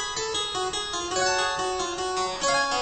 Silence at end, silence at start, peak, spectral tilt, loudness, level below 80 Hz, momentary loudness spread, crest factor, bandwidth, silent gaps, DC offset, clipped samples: 0 s; 0 s; -12 dBFS; -1 dB/octave; -26 LUFS; -52 dBFS; 4 LU; 16 dB; 9.2 kHz; none; under 0.1%; under 0.1%